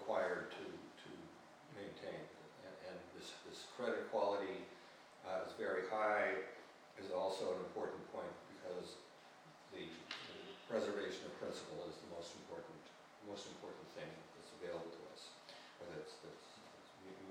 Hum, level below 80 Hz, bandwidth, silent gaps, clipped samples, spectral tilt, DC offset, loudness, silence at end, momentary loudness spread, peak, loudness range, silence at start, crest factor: none; -84 dBFS; 16 kHz; none; under 0.1%; -4 dB/octave; under 0.1%; -46 LUFS; 0 s; 18 LU; -26 dBFS; 11 LU; 0 s; 22 dB